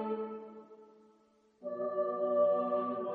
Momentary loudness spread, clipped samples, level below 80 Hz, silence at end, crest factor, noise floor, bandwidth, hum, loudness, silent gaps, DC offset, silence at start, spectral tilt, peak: 18 LU; under 0.1%; -86 dBFS; 0 s; 16 dB; -68 dBFS; 4.3 kHz; none; -33 LUFS; none; under 0.1%; 0 s; -9 dB/octave; -20 dBFS